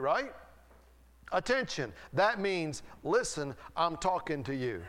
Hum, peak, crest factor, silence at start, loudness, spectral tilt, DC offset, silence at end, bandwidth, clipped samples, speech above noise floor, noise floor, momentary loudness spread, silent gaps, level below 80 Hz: none; -14 dBFS; 18 dB; 0 s; -33 LUFS; -4 dB/octave; under 0.1%; 0 s; 16 kHz; under 0.1%; 27 dB; -60 dBFS; 10 LU; none; -58 dBFS